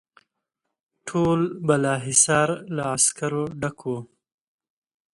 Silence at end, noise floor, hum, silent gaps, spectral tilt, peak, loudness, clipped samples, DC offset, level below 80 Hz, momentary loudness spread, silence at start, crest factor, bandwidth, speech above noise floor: 1.1 s; -81 dBFS; none; none; -4 dB/octave; -4 dBFS; -22 LUFS; under 0.1%; under 0.1%; -58 dBFS; 14 LU; 1.05 s; 20 dB; 11.5 kHz; 59 dB